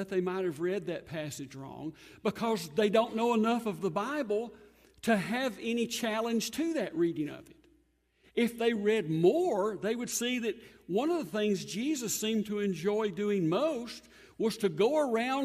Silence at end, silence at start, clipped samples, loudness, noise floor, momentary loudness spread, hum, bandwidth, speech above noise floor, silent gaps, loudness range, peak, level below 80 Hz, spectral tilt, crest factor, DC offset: 0 s; 0 s; under 0.1%; -31 LUFS; -70 dBFS; 11 LU; none; 15.5 kHz; 39 dB; none; 2 LU; -14 dBFS; -70 dBFS; -4.5 dB/octave; 18 dB; under 0.1%